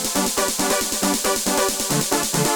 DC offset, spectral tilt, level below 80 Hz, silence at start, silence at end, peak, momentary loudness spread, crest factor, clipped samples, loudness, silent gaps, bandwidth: under 0.1%; -2.5 dB/octave; -46 dBFS; 0 s; 0 s; -2 dBFS; 1 LU; 18 dB; under 0.1%; -19 LUFS; none; over 20 kHz